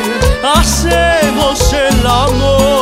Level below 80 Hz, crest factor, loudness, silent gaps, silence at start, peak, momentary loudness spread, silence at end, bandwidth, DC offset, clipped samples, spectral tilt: -18 dBFS; 10 dB; -11 LUFS; none; 0 s; 0 dBFS; 2 LU; 0 s; 16.5 kHz; under 0.1%; under 0.1%; -4 dB/octave